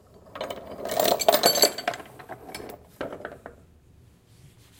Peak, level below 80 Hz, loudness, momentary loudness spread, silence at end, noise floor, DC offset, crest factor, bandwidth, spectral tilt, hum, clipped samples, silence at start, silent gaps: -2 dBFS; -60 dBFS; -23 LUFS; 23 LU; 0.35 s; -55 dBFS; under 0.1%; 26 dB; 17 kHz; -1.5 dB/octave; none; under 0.1%; 0.25 s; none